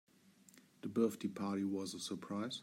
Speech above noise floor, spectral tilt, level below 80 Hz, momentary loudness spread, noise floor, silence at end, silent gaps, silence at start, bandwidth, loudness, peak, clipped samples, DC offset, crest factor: 27 dB; -5 dB/octave; -86 dBFS; 7 LU; -66 dBFS; 0 s; none; 0.55 s; 16 kHz; -40 LUFS; -22 dBFS; under 0.1%; under 0.1%; 20 dB